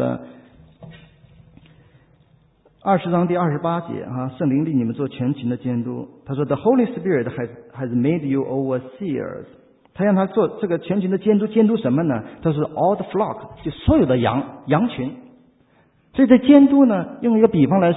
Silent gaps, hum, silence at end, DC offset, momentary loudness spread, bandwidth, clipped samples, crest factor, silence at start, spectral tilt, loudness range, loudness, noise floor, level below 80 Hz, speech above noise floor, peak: none; none; 0 s; under 0.1%; 13 LU; 4 kHz; under 0.1%; 20 dB; 0 s; -12 dB/octave; 7 LU; -19 LUFS; -57 dBFS; -44 dBFS; 39 dB; 0 dBFS